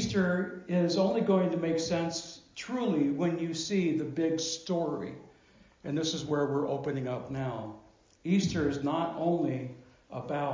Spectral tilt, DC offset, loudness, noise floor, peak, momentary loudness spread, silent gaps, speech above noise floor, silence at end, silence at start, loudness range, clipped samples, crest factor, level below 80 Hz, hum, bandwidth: -5.5 dB/octave; under 0.1%; -31 LUFS; -61 dBFS; -14 dBFS; 14 LU; none; 30 dB; 0 s; 0 s; 4 LU; under 0.1%; 18 dB; -60 dBFS; none; 7.6 kHz